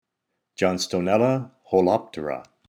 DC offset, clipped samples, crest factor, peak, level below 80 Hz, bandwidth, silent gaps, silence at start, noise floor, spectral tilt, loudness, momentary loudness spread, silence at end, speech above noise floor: under 0.1%; under 0.1%; 18 dB; -6 dBFS; -62 dBFS; 19 kHz; none; 0.6 s; -80 dBFS; -5.5 dB/octave; -23 LUFS; 11 LU; 0.25 s; 58 dB